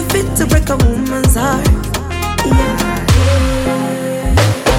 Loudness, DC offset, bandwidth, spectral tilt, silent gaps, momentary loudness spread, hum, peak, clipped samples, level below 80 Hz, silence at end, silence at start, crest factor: -14 LUFS; under 0.1%; 17 kHz; -5 dB/octave; none; 6 LU; none; 0 dBFS; under 0.1%; -18 dBFS; 0 s; 0 s; 12 dB